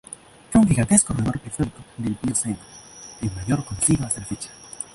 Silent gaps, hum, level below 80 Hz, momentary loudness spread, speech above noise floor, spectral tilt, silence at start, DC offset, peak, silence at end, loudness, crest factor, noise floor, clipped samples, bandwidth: none; none; -42 dBFS; 20 LU; 19 dB; -5 dB/octave; 0.1 s; under 0.1%; -2 dBFS; 0.1 s; -22 LUFS; 22 dB; -42 dBFS; under 0.1%; 12 kHz